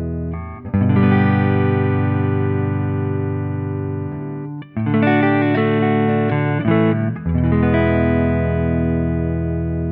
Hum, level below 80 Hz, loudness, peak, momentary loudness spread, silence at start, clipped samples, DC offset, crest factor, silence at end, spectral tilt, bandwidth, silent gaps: none; -34 dBFS; -18 LUFS; -4 dBFS; 10 LU; 0 s; under 0.1%; under 0.1%; 14 dB; 0 s; -13 dB/octave; 4.3 kHz; none